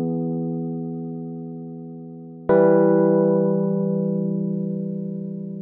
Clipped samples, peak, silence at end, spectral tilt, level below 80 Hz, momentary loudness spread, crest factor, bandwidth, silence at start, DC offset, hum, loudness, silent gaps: under 0.1%; -4 dBFS; 0 s; -11.5 dB/octave; -64 dBFS; 18 LU; 16 dB; 2.6 kHz; 0 s; under 0.1%; none; -22 LUFS; none